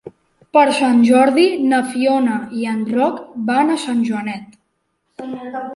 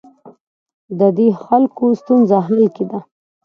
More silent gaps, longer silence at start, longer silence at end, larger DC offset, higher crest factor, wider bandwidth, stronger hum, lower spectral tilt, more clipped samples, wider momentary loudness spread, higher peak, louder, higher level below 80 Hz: second, none vs 0.41-0.66 s, 0.74-0.88 s; second, 0.05 s vs 0.25 s; second, 0 s vs 0.45 s; neither; about the same, 14 dB vs 16 dB; first, 11.5 kHz vs 6.4 kHz; neither; second, -5 dB/octave vs -10.5 dB/octave; neither; first, 16 LU vs 12 LU; about the same, -2 dBFS vs 0 dBFS; about the same, -16 LUFS vs -15 LUFS; about the same, -64 dBFS vs -64 dBFS